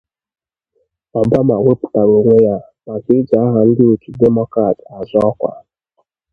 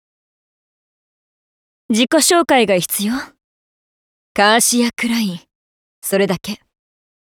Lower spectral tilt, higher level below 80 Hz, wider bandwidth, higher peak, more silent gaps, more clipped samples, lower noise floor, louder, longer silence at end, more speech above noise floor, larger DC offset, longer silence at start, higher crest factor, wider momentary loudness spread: first, -11.5 dB/octave vs -3 dB/octave; first, -48 dBFS vs -58 dBFS; second, 4.9 kHz vs over 20 kHz; about the same, 0 dBFS vs 0 dBFS; second, none vs 3.44-4.35 s, 5.55-6.02 s; neither; second, -65 dBFS vs under -90 dBFS; about the same, -14 LUFS vs -15 LUFS; about the same, 0.75 s vs 0.85 s; second, 53 dB vs over 75 dB; neither; second, 1.15 s vs 1.9 s; second, 14 dB vs 20 dB; second, 12 LU vs 16 LU